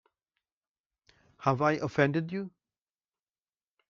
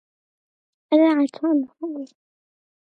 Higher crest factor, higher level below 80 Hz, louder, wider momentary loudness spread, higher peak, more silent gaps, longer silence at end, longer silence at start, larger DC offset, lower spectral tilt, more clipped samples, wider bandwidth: about the same, 22 dB vs 18 dB; first, -70 dBFS vs -82 dBFS; second, -29 LUFS vs -20 LUFS; second, 11 LU vs 17 LU; second, -12 dBFS vs -6 dBFS; neither; first, 1.4 s vs 0.8 s; first, 1.4 s vs 0.9 s; neither; about the same, -6 dB/octave vs -5.5 dB/octave; neither; second, 7.2 kHz vs 8.2 kHz